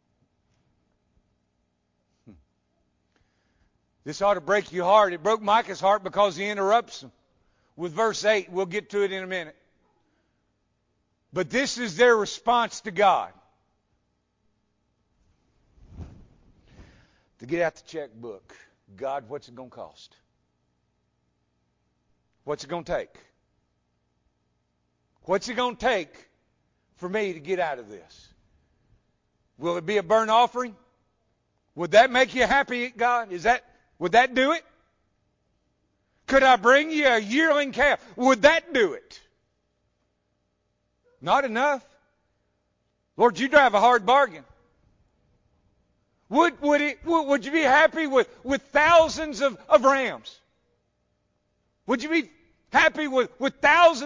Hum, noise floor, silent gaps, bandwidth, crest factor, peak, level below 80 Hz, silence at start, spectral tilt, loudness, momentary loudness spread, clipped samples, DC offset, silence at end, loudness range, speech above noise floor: 60 Hz at -65 dBFS; -74 dBFS; none; 7.6 kHz; 20 dB; -6 dBFS; -58 dBFS; 2.3 s; -3.5 dB/octave; -22 LUFS; 18 LU; under 0.1%; under 0.1%; 0 s; 14 LU; 51 dB